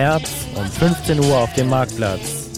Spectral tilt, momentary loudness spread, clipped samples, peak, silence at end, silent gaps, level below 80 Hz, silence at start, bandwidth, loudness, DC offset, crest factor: -5 dB/octave; 9 LU; under 0.1%; -4 dBFS; 0 s; none; -38 dBFS; 0 s; 16.5 kHz; -19 LUFS; 0.4%; 14 dB